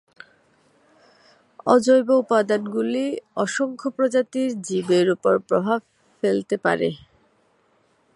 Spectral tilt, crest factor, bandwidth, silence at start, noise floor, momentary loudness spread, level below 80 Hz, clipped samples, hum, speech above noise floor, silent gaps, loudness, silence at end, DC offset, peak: -5.5 dB/octave; 20 dB; 11.5 kHz; 1.65 s; -63 dBFS; 9 LU; -68 dBFS; under 0.1%; none; 42 dB; none; -21 LUFS; 1.2 s; under 0.1%; -2 dBFS